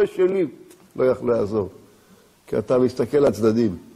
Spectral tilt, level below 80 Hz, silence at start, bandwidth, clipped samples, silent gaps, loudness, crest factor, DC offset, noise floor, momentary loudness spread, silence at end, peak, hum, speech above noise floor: -7.5 dB/octave; -54 dBFS; 0 s; 14 kHz; under 0.1%; none; -21 LUFS; 14 dB; under 0.1%; -54 dBFS; 9 LU; 0.15 s; -8 dBFS; none; 33 dB